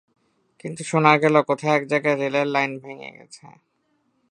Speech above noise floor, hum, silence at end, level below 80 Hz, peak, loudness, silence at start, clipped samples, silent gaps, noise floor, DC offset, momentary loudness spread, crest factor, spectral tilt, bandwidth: 47 dB; none; 0.85 s; -74 dBFS; 0 dBFS; -20 LUFS; 0.65 s; under 0.1%; none; -69 dBFS; under 0.1%; 21 LU; 22 dB; -5.5 dB/octave; 11 kHz